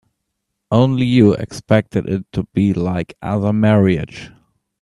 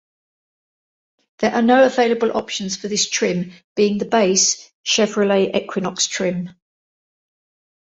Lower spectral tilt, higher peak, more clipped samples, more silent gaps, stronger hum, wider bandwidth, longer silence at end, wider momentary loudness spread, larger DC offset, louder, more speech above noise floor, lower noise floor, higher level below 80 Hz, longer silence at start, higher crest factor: first, -8 dB/octave vs -3 dB/octave; about the same, 0 dBFS vs -2 dBFS; neither; second, none vs 3.64-3.76 s, 4.75-4.84 s; neither; first, 11.5 kHz vs 8.2 kHz; second, 0.55 s vs 1.4 s; about the same, 10 LU vs 11 LU; neither; about the same, -17 LUFS vs -18 LUFS; second, 59 dB vs over 72 dB; second, -75 dBFS vs under -90 dBFS; first, -46 dBFS vs -62 dBFS; second, 0.7 s vs 1.4 s; about the same, 16 dB vs 18 dB